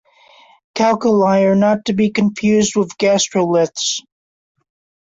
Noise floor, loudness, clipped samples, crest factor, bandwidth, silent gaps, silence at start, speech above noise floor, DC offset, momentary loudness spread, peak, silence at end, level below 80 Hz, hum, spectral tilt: -48 dBFS; -15 LUFS; under 0.1%; 14 dB; 8 kHz; none; 0.75 s; 33 dB; under 0.1%; 6 LU; -4 dBFS; 1.05 s; -56 dBFS; none; -4.5 dB/octave